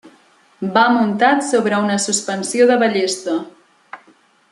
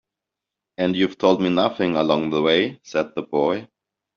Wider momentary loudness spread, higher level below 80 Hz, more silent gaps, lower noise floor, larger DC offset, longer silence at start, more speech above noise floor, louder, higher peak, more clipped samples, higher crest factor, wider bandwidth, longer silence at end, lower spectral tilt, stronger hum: first, 10 LU vs 7 LU; second, -68 dBFS vs -62 dBFS; neither; second, -53 dBFS vs -86 dBFS; neither; second, 0.05 s vs 0.8 s; second, 37 dB vs 65 dB; first, -16 LUFS vs -21 LUFS; about the same, -2 dBFS vs -4 dBFS; neither; about the same, 16 dB vs 18 dB; first, 12 kHz vs 7 kHz; about the same, 0.55 s vs 0.5 s; about the same, -3.5 dB/octave vs -4 dB/octave; neither